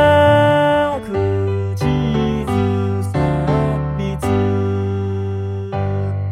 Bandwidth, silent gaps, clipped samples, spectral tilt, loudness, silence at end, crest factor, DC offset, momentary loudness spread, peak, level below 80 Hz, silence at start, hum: 12 kHz; none; under 0.1%; -7.5 dB/octave; -18 LUFS; 0 s; 14 dB; under 0.1%; 9 LU; -2 dBFS; -34 dBFS; 0 s; none